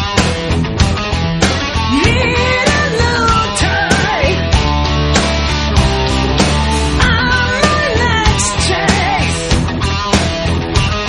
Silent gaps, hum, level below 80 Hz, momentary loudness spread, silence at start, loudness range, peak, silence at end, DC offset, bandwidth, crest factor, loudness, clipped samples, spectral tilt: none; none; -20 dBFS; 3 LU; 0 s; 1 LU; 0 dBFS; 0 s; under 0.1%; 11.5 kHz; 12 dB; -13 LUFS; under 0.1%; -4.5 dB/octave